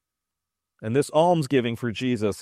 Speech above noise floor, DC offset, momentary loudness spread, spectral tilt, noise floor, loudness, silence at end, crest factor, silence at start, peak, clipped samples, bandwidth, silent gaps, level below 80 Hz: 63 dB; under 0.1%; 8 LU; -6 dB/octave; -86 dBFS; -23 LUFS; 0 s; 18 dB; 0.8 s; -6 dBFS; under 0.1%; 15 kHz; none; -62 dBFS